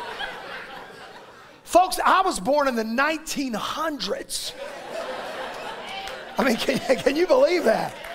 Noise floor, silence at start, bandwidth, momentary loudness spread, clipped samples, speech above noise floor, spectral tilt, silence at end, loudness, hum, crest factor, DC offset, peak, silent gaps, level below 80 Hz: -46 dBFS; 0 s; 16 kHz; 17 LU; under 0.1%; 24 dB; -3.5 dB/octave; 0 s; -23 LUFS; none; 20 dB; under 0.1%; -4 dBFS; none; -52 dBFS